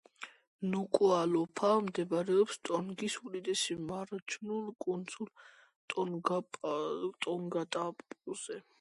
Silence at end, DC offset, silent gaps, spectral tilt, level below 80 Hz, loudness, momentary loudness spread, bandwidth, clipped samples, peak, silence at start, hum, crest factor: 0.2 s; under 0.1%; 0.47-0.59 s, 4.22-4.26 s, 5.76-5.88 s; -4.5 dB/octave; -78 dBFS; -35 LUFS; 14 LU; 11.5 kHz; under 0.1%; -14 dBFS; 0.2 s; none; 22 dB